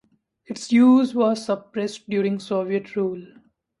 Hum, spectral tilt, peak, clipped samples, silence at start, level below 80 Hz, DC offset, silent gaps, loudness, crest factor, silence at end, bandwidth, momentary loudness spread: none; -6 dB/octave; -6 dBFS; under 0.1%; 0.5 s; -70 dBFS; under 0.1%; none; -21 LUFS; 16 dB; 0.55 s; 11 kHz; 14 LU